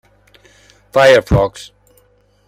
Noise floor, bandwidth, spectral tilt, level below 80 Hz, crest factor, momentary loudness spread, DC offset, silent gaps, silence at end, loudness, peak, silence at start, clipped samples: -54 dBFS; 15.5 kHz; -5.5 dB/octave; -32 dBFS; 16 dB; 13 LU; under 0.1%; none; 0.85 s; -12 LUFS; 0 dBFS; 0.95 s; under 0.1%